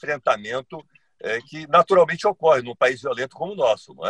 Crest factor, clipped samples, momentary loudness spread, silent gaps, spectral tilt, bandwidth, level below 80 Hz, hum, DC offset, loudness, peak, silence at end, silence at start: 20 dB; under 0.1%; 13 LU; none; -4.5 dB/octave; 10 kHz; -64 dBFS; none; under 0.1%; -21 LUFS; -2 dBFS; 0 s; 0.05 s